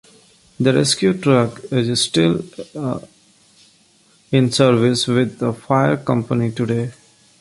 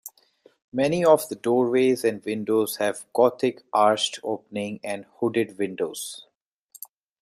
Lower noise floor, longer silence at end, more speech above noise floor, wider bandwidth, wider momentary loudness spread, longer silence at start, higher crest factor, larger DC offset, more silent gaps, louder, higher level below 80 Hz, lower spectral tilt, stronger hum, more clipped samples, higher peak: second, -55 dBFS vs -59 dBFS; second, 0.5 s vs 1 s; about the same, 38 dB vs 36 dB; second, 11.5 kHz vs 15 kHz; second, 11 LU vs 15 LU; first, 0.6 s vs 0.05 s; about the same, 18 dB vs 20 dB; neither; second, none vs 0.64-0.72 s; first, -18 LUFS vs -24 LUFS; first, -54 dBFS vs -70 dBFS; about the same, -5.5 dB/octave vs -4.5 dB/octave; neither; neither; about the same, -2 dBFS vs -4 dBFS